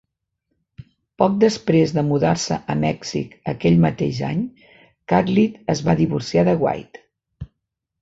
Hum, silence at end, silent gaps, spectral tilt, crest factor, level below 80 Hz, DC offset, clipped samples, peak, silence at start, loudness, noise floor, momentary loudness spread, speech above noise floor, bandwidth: none; 0.55 s; none; -6.5 dB/octave; 18 dB; -48 dBFS; under 0.1%; under 0.1%; -2 dBFS; 1.2 s; -20 LUFS; -79 dBFS; 12 LU; 60 dB; 8 kHz